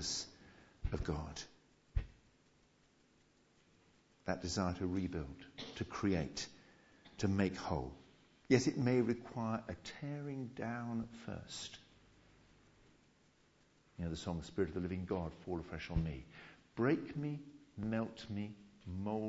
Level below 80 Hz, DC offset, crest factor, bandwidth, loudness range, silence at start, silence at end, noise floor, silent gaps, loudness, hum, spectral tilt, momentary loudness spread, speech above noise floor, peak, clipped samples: -54 dBFS; under 0.1%; 26 dB; 7.6 kHz; 11 LU; 0 s; 0 s; -71 dBFS; none; -41 LUFS; none; -6 dB/octave; 15 LU; 32 dB; -14 dBFS; under 0.1%